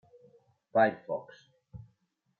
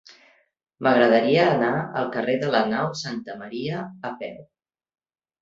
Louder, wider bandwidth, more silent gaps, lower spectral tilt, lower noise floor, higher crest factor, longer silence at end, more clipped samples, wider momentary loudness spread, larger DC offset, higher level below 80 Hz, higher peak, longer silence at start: second, -30 LUFS vs -22 LUFS; second, 6.6 kHz vs 7.8 kHz; neither; first, -8 dB/octave vs -6 dB/octave; first, -75 dBFS vs -58 dBFS; about the same, 22 dB vs 20 dB; second, 0.6 s vs 1 s; neither; first, 25 LU vs 16 LU; neither; about the same, -70 dBFS vs -66 dBFS; second, -14 dBFS vs -4 dBFS; about the same, 0.75 s vs 0.8 s